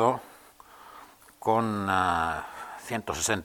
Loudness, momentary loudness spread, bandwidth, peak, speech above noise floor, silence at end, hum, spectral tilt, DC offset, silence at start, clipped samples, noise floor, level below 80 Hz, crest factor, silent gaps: -28 LUFS; 23 LU; 19 kHz; -8 dBFS; 26 dB; 0 s; none; -4 dB/octave; under 0.1%; 0 s; under 0.1%; -52 dBFS; -56 dBFS; 20 dB; none